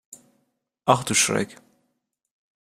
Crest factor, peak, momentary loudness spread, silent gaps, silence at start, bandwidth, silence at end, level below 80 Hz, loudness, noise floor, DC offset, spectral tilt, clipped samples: 26 dB; -2 dBFS; 10 LU; none; 0.85 s; 15.5 kHz; 1.1 s; -62 dBFS; -22 LUFS; -76 dBFS; under 0.1%; -2.5 dB/octave; under 0.1%